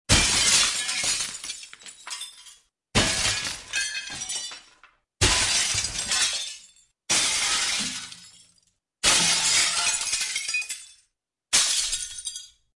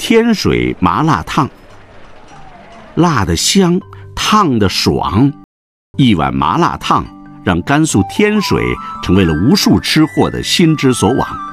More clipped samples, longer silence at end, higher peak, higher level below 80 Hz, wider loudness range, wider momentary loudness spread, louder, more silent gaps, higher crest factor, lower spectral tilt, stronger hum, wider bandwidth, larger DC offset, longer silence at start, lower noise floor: neither; first, 0.3 s vs 0 s; second, -6 dBFS vs 0 dBFS; second, -44 dBFS vs -36 dBFS; about the same, 5 LU vs 3 LU; first, 17 LU vs 7 LU; second, -22 LUFS vs -12 LUFS; second, none vs 5.44-5.94 s; first, 22 dB vs 12 dB; second, -0.5 dB/octave vs -5 dB/octave; neither; second, 12 kHz vs 16 kHz; neither; about the same, 0.1 s vs 0 s; first, -73 dBFS vs -36 dBFS